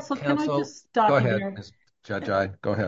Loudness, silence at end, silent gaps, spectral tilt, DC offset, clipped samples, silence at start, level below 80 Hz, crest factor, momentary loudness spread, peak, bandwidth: -25 LUFS; 0 s; none; -6.5 dB/octave; under 0.1%; under 0.1%; 0 s; -56 dBFS; 18 dB; 13 LU; -6 dBFS; 7.8 kHz